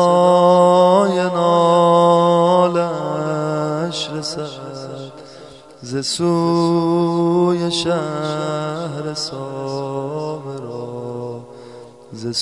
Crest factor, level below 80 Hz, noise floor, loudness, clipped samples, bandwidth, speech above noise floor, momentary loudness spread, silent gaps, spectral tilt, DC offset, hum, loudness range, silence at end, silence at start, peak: 16 dB; -62 dBFS; -40 dBFS; -17 LUFS; under 0.1%; 11.5 kHz; 22 dB; 18 LU; none; -6 dB/octave; 0.1%; none; 11 LU; 0 s; 0 s; -2 dBFS